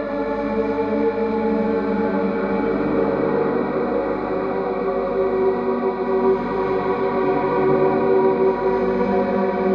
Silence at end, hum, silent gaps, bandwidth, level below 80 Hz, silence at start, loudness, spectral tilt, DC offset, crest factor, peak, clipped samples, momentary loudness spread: 0 s; 50 Hz at -35 dBFS; none; 5.4 kHz; -46 dBFS; 0 s; -20 LUFS; -9.5 dB/octave; under 0.1%; 14 dB; -6 dBFS; under 0.1%; 5 LU